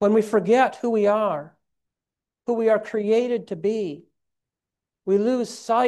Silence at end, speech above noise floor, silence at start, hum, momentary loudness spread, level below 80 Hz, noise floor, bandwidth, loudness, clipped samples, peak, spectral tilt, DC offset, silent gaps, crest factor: 0 s; 68 dB; 0 s; none; 13 LU; -74 dBFS; -89 dBFS; 12 kHz; -22 LUFS; under 0.1%; -8 dBFS; -6 dB/octave; under 0.1%; none; 16 dB